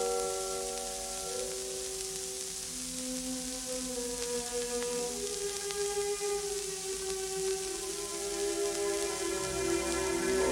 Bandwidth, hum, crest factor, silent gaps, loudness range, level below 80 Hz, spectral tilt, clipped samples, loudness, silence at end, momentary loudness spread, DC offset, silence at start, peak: 18 kHz; none; 22 dB; none; 3 LU; -54 dBFS; -2 dB/octave; under 0.1%; -34 LUFS; 0 s; 4 LU; under 0.1%; 0 s; -14 dBFS